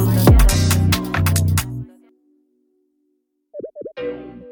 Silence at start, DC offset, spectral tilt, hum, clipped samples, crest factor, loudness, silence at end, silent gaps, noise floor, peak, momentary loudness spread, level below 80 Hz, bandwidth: 0 s; under 0.1%; -5.5 dB/octave; none; under 0.1%; 18 dB; -17 LUFS; 0 s; none; -69 dBFS; 0 dBFS; 22 LU; -24 dBFS; 19 kHz